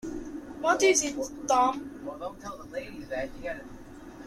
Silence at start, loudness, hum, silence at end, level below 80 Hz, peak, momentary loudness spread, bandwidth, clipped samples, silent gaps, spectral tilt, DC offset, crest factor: 0.05 s; -29 LUFS; none; 0 s; -54 dBFS; -10 dBFS; 18 LU; 14.5 kHz; under 0.1%; none; -2.5 dB/octave; under 0.1%; 20 dB